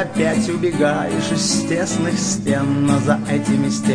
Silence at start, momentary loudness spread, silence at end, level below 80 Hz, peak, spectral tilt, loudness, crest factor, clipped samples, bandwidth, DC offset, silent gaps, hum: 0 s; 3 LU; 0 s; -48 dBFS; -4 dBFS; -5 dB/octave; -18 LUFS; 14 dB; under 0.1%; 10.5 kHz; under 0.1%; none; none